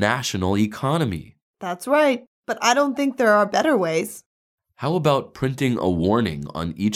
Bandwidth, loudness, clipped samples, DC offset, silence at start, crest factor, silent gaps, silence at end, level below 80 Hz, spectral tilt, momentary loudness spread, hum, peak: 16 kHz; -21 LUFS; under 0.1%; under 0.1%; 0 s; 18 dB; 1.42-1.54 s, 2.27-2.43 s, 4.26-4.58 s; 0 s; -50 dBFS; -5 dB/octave; 12 LU; none; -4 dBFS